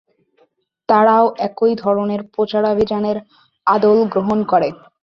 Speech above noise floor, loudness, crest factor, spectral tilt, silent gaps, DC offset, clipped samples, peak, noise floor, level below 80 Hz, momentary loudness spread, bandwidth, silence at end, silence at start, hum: 44 dB; -16 LUFS; 16 dB; -8 dB/octave; none; under 0.1%; under 0.1%; -2 dBFS; -59 dBFS; -54 dBFS; 9 LU; 6.2 kHz; 0.3 s; 0.9 s; none